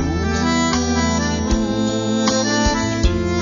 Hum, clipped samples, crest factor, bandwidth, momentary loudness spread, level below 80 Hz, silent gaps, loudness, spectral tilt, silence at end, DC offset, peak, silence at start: none; under 0.1%; 14 dB; 7.4 kHz; 3 LU; -26 dBFS; none; -18 LUFS; -4.5 dB/octave; 0 s; under 0.1%; -4 dBFS; 0 s